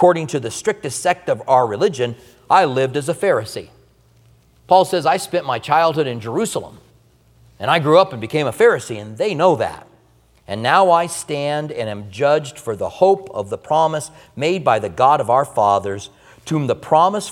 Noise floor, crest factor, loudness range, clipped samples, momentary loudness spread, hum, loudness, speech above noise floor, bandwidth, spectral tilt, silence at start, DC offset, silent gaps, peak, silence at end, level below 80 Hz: -54 dBFS; 18 dB; 2 LU; under 0.1%; 12 LU; none; -18 LUFS; 37 dB; 16 kHz; -5 dB/octave; 0 s; under 0.1%; none; 0 dBFS; 0 s; -58 dBFS